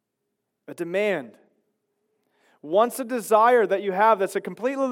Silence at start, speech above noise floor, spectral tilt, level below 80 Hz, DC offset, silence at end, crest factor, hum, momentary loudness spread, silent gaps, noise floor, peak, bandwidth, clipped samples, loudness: 0.7 s; 57 dB; -4.5 dB/octave; under -90 dBFS; under 0.1%; 0 s; 18 dB; none; 11 LU; none; -79 dBFS; -6 dBFS; 17 kHz; under 0.1%; -22 LUFS